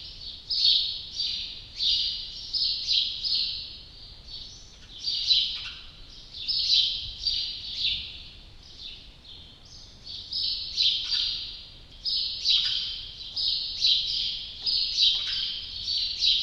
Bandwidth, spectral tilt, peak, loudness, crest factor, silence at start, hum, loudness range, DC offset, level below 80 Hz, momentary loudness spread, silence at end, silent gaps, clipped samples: 12 kHz; 0 dB/octave; -8 dBFS; -25 LUFS; 22 dB; 0 s; none; 5 LU; under 0.1%; -50 dBFS; 21 LU; 0 s; none; under 0.1%